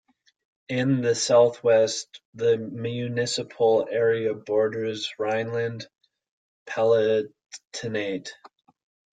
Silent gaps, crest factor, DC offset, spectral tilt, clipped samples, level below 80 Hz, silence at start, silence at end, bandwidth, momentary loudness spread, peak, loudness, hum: 2.25-2.33 s, 6.31-6.66 s, 7.46-7.50 s, 7.67-7.71 s; 18 dB; under 0.1%; -4.5 dB/octave; under 0.1%; -70 dBFS; 0.7 s; 0.65 s; 9.4 kHz; 14 LU; -8 dBFS; -24 LUFS; none